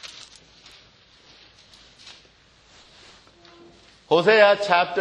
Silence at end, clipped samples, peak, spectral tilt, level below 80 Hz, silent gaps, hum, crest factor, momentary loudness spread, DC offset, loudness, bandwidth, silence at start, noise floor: 0 s; under 0.1%; -4 dBFS; -4 dB/octave; -64 dBFS; none; none; 22 dB; 25 LU; under 0.1%; -18 LUFS; 9.8 kHz; 0.05 s; -55 dBFS